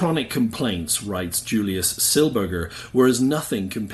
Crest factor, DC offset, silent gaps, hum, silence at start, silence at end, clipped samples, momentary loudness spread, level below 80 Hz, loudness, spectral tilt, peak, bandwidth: 16 dB; under 0.1%; none; none; 0 s; 0 s; under 0.1%; 8 LU; -48 dBFS; -21 LUFS; -4 dB/octave; -6 dBFS; 12.5 kHz